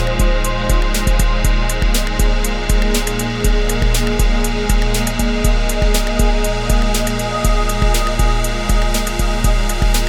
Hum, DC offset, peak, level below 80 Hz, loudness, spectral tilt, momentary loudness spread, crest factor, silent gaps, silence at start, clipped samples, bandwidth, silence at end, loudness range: none; under 0.1%; 0 dBFS; -16 dBFS; -17 LUFS; -4.5 dB/octave; 2 LU; 14 dB; none; 0 s; under 0.1%; 17 kHz; 0 s; 0 LU